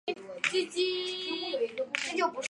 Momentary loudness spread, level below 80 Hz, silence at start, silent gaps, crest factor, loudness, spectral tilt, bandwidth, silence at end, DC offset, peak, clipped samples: 4 LU; -80 dBFS; 0.05 s; none; 24 dB; -31 LUFS; -1.5 dB/octave; 11.5 kHz; 0.05 s; under 0.1%; -10 dBFS; under 0.1%